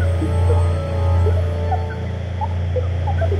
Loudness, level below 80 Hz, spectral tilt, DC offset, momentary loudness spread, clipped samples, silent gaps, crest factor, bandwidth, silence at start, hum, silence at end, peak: -20 LUFS; -28 dBFS; -8 dB/octave; under 0.1%; 7 LU; under 0.1%; none; 12 dB; 8.8 kHz; 0 s; none; 0 s; -6 dBFS